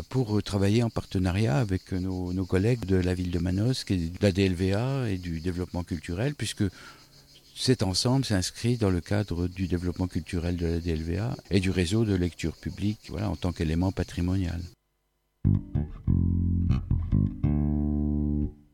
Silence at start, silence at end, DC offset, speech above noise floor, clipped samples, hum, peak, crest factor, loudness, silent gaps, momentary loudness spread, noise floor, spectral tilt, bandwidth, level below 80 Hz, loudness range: 0 s; 0.2 s; under 0.1%; 48 dB; under 0.1%; none; -10 dBFS; 16 dB; -28 LUFS; none; 7 LU; -74 dBFS; -6.5 dB/octave; 15 kHz; -40 dBFS; 3 LU